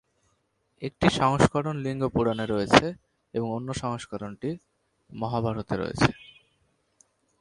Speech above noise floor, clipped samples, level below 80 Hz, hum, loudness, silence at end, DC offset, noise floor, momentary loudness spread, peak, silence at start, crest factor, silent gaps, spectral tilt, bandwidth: 46 dB; under 0.1%; -50 dBFS; none; -26 LUFS; 1.2 s; under 0.1%; -72 dBFS; 17 LU; 0 dBFS; 0.8 s; 28 dB; none; -5.5 dB/octave; 11.5 kHz